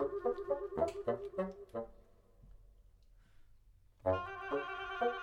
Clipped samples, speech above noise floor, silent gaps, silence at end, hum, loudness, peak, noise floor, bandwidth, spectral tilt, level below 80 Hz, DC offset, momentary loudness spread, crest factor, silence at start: under 0.1%; 23 dB; none; 0 s; none; -39 LUFS; -20 dBFS; -64 dBFS; 12 kHz; -6.5 dB/octave; -62 dBFS; under 0.1%; 9 LU; 20 dB; 0 s